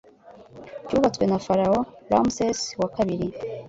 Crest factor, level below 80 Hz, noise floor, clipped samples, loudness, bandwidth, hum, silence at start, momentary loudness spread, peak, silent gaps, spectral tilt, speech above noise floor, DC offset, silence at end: 20 dB; -52 dBFS; -49 dBFS; under 0.1%; -24 LUFS; 8 kHz; none; 0.25 s; 10 LU; -6 dBFS; none; -5.5 dB/octave; 26 dB; under 0.1%; 0 s